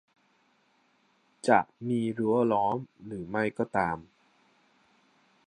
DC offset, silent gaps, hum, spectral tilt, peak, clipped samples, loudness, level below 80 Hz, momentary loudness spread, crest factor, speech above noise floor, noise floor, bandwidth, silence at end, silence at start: under 0.1%; none; none; -7 dB/octave; -8 dBFS; under 0.1%; -29 LUFS; -64 dBFS; 12 LU; 24 dB; 40 dB; -69 dBFS; 10 kHz; 1.45 s; 1.45 s